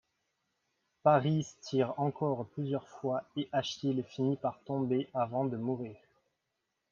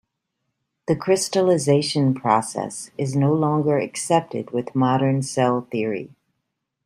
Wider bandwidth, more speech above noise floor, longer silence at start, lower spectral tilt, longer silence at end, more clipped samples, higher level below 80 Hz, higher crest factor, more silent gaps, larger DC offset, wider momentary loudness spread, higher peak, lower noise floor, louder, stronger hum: second, 7.2 kHz vs 15 kHz; second, 52 dB vs 57 dB; first, 1.05 s vs 0.9 s; first, -7 dB/octave vs -5.5 dB/octave; first, 0.95 s vs 0.8 s; neither; second, -74 dBFS vs -64 dBFS; about the same, 20 dB vs 18 dB; neither; neither; about the same, 8 LU vs 9 LU; second, -14 dBFS vs -2 dBFS; first, -84 dBFS vs -78 dBFS; second, -33 LUFS vs -21 LUFS; neither